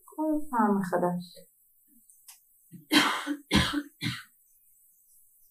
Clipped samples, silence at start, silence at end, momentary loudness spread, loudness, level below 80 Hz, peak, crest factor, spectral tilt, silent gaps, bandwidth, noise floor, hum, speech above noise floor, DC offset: under 0.1%; 0.2 s; 1.3 s; 12 LU; -28 LUFS; -50 dBFS; -6 dBFS; 24 dB; -4 dB/octave; none; 15.5 kHz; -63 dBFS; none; 35 dB; under 0.1%